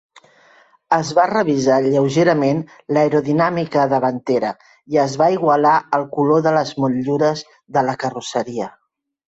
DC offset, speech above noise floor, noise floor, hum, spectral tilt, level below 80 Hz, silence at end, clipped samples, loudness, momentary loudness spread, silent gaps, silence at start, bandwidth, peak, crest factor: under 0.1%; 35 dB; -52 dBFS; none; -6 dB/octave; -60 dBFS; 0.6 s; under 0.1%; -17 LUFS; 9 LU; none; 0.9 s; 8.2 kHz; -2 dBFS; 16 dB